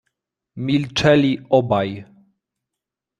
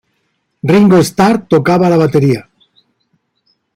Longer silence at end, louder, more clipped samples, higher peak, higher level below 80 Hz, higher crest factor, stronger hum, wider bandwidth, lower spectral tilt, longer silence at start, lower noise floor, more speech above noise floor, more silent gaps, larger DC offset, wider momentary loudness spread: second, 1.15 s vs 1.35 s; second, -18 LUFS vs -11 LUFS; neither; about the same, -2 dBFS vs 0 dBFS; about the same, -52 dBFS vs -48 dBFS; first, 18 dB vs 12 dB; neither; second, 9.8 kHz vs 16 kHz; about the same, -6 dB/octave vs -7 dB/octave; about the same, 0.55 s vs 0.65 s; first, -84 dBFS vs -64 dBFS; first, 67 dB vs 55 dB; neither; neither; first, 13 LU vs 7 LU